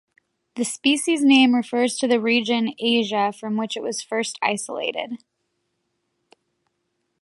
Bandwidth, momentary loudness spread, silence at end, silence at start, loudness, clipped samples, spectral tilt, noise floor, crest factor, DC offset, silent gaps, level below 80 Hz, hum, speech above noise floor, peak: 11.5 kHz; 12 LU; 2.05 s; 0.55 s; -21 LUFS; under 0.1%; -3 dB/octave; -74 dBFS; 18 dB; under 0.1%; none; -74 dBFS; none; 53 dB; -4 dBFS